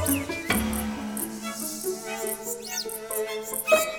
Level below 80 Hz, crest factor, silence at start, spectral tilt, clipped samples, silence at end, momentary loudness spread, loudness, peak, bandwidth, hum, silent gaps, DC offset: -48 dBFS; 22 dB; 0 s; -3 dB/octave; under 0.1%; 0 s; 7 LU; -28 LUFS; -8 dBFS; over 20 kHz; none; none; under 0.1%